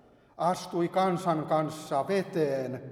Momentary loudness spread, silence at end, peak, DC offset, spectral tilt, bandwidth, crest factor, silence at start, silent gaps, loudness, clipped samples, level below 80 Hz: 4 LU; 0 s; -12 dBFS; under 0.1%; -6.5 dB/octave; 16 kHz; 16 dB; 0.4 s; none; -29 LUFS; under 0.1%; -70 dBFS